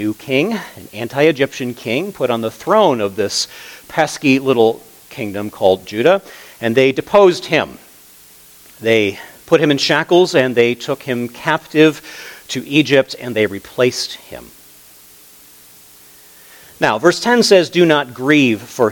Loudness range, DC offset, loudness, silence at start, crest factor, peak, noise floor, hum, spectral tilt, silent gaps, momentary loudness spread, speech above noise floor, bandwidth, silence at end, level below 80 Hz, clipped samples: 5 LU; under 0.1%; -15 LUFS; 0 s; 16 dB; 0 dBFS; -43 dBFS; none; -4.5 dB/octave; none; 13 LU; 28 dB; 19.5 kHz; 0 s; -58 dBFS; under 0.1%